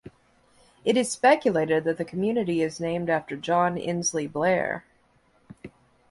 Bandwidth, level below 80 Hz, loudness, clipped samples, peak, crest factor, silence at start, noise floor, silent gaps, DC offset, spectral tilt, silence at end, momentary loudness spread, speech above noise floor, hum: 11.5 kHz; -62 dBFS; -25 LUFS; under 0.1%; -6 dBFS; 20 dB; 0.85 s; -63 dBFS; none; under 0.1%; -4.5 dB/octave; 0.4 s; 8 LU; 39 dB; none